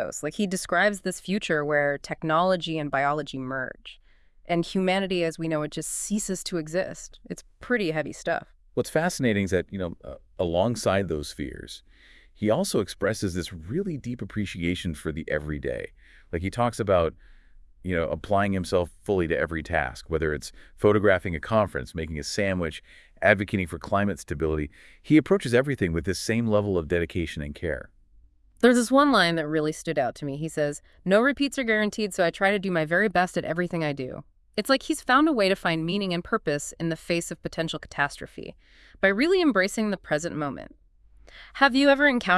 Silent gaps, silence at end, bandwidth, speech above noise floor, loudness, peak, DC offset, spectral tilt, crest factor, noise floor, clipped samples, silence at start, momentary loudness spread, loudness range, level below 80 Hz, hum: none; 0 s; 12 kHz; 31 dB; -26 LUFS; -4 dBFS; under 0.1%; -5 dB/octave; 22 dB; -57 dBFS; under 0.1%; 0 s; 13 LU; 5 LU; -50 dBFS; none